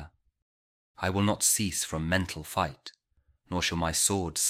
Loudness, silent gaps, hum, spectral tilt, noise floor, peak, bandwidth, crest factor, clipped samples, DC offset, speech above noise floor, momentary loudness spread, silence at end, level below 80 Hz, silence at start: -28 LUFS; 0.42-0.95 s; none; -3 dB/octave; -69 dBFS; -8 dBFS; 16.5 kHz; 22 dB; under 0.1%; under 0.1%; 40 dB; 10 LU; 0 s; -50 dBFS; 0 s